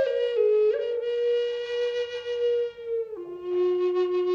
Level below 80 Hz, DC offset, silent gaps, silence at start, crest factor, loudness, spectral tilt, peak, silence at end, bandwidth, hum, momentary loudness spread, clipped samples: -70 dBFS; under 0.1%; none; 0 s; 12 dB; -26 LUFS; -4.5 dB/octave; -14 dBFS; 0 s; 7 kHz; none; 9 LU; under 0.1%